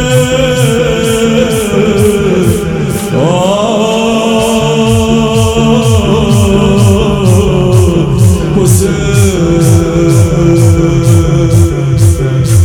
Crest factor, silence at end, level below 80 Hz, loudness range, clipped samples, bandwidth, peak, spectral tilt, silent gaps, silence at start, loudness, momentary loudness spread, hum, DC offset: 8 dB; 0 s; -22 dBFS; 2 LU; 2%; 18.5 kHz; 0 dBFS; -6 dB/octave; none; 0 s; -8 LUFS; 2 LU; none; 0.3%